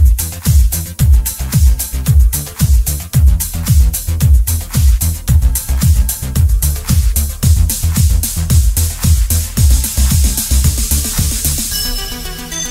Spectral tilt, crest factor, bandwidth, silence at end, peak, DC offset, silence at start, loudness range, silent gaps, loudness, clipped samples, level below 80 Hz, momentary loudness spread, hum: -4 dB/octave; 12 dB; 16.5 kHz; 0 s; 0 dBFS; under 0.1%; 0 s; 1 LU; none; -13 LUFS; under 0.1%; -14 dBFS; 4 LU; none